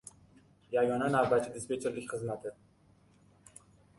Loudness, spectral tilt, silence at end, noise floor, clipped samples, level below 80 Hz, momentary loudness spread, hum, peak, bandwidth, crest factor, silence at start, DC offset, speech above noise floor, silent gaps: -32 LUFS; -5.5 dB/octave; 1.45 s; -64 dBFS; under 0.1%; -68 dBFS; 13 LU; none; -14 dBFS; 11.5 kHz; 20 dB; 0.05 s; under 0.1%; 33 dB; none